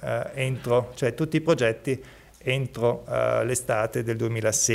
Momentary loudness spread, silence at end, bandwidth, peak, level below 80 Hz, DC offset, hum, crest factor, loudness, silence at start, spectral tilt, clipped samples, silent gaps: 6 LU; 0 s; 16 kHz; -10 dBFS; -54 dBFS; under 0.1%; none; 16 dB; -26 LUFS; 0 s; -4.5 dB/octave; under 0.1%; none